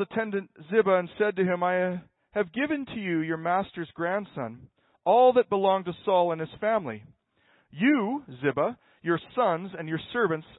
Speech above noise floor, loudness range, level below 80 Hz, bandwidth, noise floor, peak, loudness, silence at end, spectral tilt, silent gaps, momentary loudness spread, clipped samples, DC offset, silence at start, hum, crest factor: 39 dB; 4 LU; -68 dBFS; 4.1 kHz; -66 dBFS; -10 dBFS; -27 LUFS; 0.15 s; -10.5 dB/octave; none; 11 LU; under 0.1%; under 0.1%; 0 s; none; 18 dB